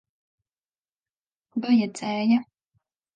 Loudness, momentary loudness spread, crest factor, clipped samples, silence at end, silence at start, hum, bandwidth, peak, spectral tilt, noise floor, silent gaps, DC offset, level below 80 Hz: -24 LUFS; 9 LU; 16 dB; under 0.1%; 0.7 s; 1.55 s; none; 9.4 kHz; -10 dBFS; -5.5 dB/octave; under -90 dBFS; none; under 0.1%; -78 dBFS